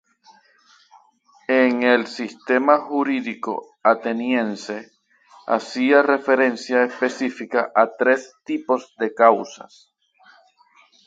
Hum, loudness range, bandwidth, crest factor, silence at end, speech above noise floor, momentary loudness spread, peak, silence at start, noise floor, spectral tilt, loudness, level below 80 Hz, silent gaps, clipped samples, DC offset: none; 3 LU; 7.8 kHz; 20 dB; 1.5 s; 37 dB; 13 LU; 0 dBFS; 1.5 s; -56 dBFS; -4.5 dB/octave; -20 LUFS; -74 dBFS; none; under 0.1%; under 0.1%